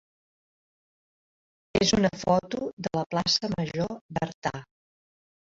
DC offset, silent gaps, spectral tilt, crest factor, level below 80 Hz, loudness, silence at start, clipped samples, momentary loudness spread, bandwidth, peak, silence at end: under 0.1%; 2.73-2.77 s, 3.06-3.10 s, 4.01-4.09 s, 4.34-4.42 s; -4.5 dB/octave; 20 dB; -54 dBFS; -27 LUFS; 1.75 s; under 0.1%; 10 LU; 8 kHz; -10 dBFS; 0.95 s